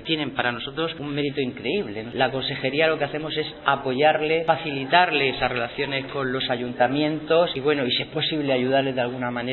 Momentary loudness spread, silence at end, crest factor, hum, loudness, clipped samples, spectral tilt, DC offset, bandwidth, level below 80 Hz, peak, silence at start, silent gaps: 7 LU; 0 s; 22 dB; none; -23 LUFS; under 0.1%; -2.5 dB/octave; under 0.1%; 4.3 kHz; -54 dBFS; -2 dBFS; 0 s; none